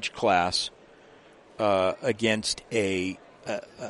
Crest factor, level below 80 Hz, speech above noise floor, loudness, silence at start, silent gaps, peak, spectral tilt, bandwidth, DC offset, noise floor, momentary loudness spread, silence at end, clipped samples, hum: 20 dB; -60 dBFS; 27 dB; -27 LUFS; 0 s; none; -8 dBFS; -3.5 dB/octave; 11.5 kHz; under 0.1%; -53 dBFS; 11 LU; 0 s; under 0.1%; none